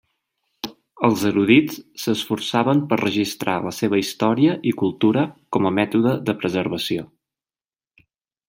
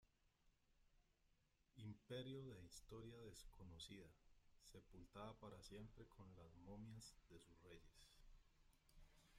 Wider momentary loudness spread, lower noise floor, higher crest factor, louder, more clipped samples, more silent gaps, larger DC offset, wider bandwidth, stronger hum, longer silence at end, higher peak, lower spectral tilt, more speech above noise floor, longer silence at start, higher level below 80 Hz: about the same, 10 LU vs 12 LU; first, under -90 dBFS vs -83 dBFS; about the same, 20 dB vs 20 dB; first, -20 LUFS vs -61 LUFS; neither; neither; neither; about the same, 16.5 kHz vs 15 kHz; neither; first, 1.45 s vs 0 s; first, -2 dBFS vs -42 dBFS; about the same, -5.5 dB/octave vs -5 dB/octave; first, over 70 dB vs 22 dB; first, 0.65 s vs 0 s; first, -62 dBFS vs -72 dBFS